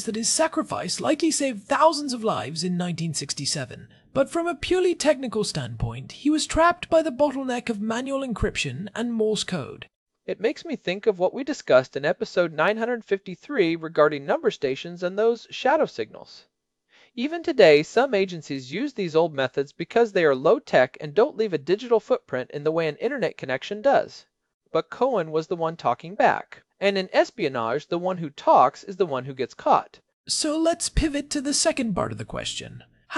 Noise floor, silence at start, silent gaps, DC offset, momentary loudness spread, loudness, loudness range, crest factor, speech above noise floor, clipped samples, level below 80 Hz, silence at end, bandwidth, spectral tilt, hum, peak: -64 dBFS; 0 s; 9.96-10.06 s, 24.54-24.60 s, 30.13-30.24 s; under 0.1%; 10 LU; -24 LUFS; 3 LU; 22 dB; 41 dB; under 0.1%; -46 dBFS; 0 s; 12 kHz; -4 dB/octave; none; -2 dBFS